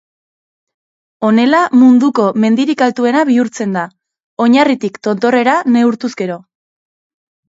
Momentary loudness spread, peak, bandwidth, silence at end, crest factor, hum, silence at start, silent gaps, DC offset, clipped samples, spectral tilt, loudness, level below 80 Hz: 12 LU; 0 dBFS; 7.8 kHz; 1.1 s; 14 dB; none; 1.2 s; 4.24-4.37 s; under 0.1%; under 0.1%; -5.5 dB/octave; -12 LUFS; -64 dBFS